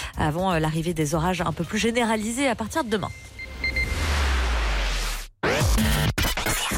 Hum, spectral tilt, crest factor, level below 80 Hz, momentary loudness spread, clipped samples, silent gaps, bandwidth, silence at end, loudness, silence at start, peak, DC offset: none; -4.5 dB/octave; 14 dB; -30 dBFS; 6 LU; under 0.1%; none; 17 kHz; 0 s; -24 LUFS; 0 s; -10 dBFS; under 0.1%